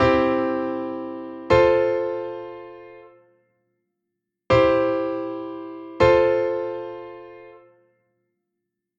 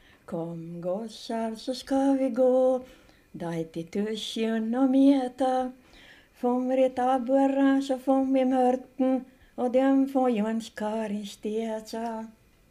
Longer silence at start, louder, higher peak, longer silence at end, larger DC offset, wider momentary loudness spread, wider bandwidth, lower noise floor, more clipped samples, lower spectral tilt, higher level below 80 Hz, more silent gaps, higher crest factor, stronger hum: second, 0 s vs 0.3 s; first, -21 LUFS vs -27 LUFS; first, -4 dBFS vs -10 dBFS; first, 1.4 s vs 0.4 s; neither; first, 21 LU vs 12 LU; second, 7.4 kHz vs 12.5 kHz; first, -81 dBFS vs -54 dBFS; neither; about the same, -7 dB/octave vs -6 dB/octave; first, -48 dBFS vs -64 dBFS; neither; about the same, 20 dB vs 16 dB; neither